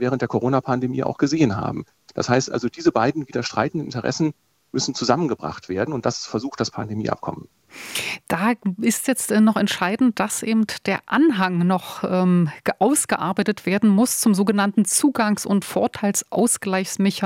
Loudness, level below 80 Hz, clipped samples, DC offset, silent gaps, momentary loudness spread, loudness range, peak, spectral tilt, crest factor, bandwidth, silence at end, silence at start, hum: -21 LUFS; -60 dBFS; under 0.1%; under 0.1%; none; 9 LU; 6 LU; -2 dBFS; -4.5 dB/octave; 18 dB; 16.5 kHz; 0 s; 0 s; none